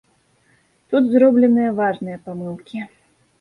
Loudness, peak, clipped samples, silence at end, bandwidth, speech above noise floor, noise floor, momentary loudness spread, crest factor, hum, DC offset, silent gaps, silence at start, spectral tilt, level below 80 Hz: -17 LUFS; -2 dBFS; under 0.1%; 0.55 s; 4.2 kHz; 43 dB; -60 dBFS; 18 LU; 16 dB; none; under 0.1%; none; 0.9 s; -8.5 dB/octave; -64 dBFS